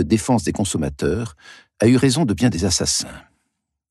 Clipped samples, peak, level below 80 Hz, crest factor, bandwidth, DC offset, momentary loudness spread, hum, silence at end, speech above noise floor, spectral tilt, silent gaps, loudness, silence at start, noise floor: under 0.1%; -4 dBFS; -40 dBFS; 16 dB; 12.5 kHz; under 0.1%; 8 LU; none; 0.7 s; 56 dB; -4.5 dB/octave; none; -19 LUFS; 0 s; -75 dBFS